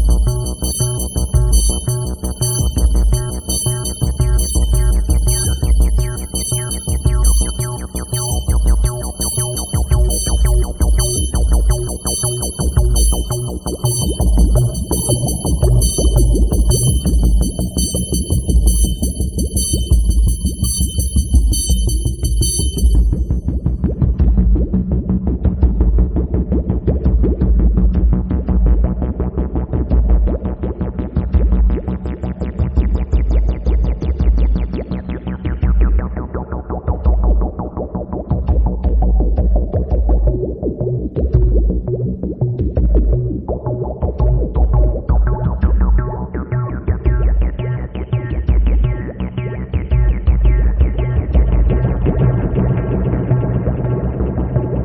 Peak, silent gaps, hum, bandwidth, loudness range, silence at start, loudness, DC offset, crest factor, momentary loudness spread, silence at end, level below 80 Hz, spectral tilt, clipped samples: 0 dBFS; none; none; 19 kHz; 3 LU; 0 s; -17 LUFS; under 0.1%; 14 dB; 7 LU; 0 s; -16 dBFS; -5.5 dB/octave; under 0.1%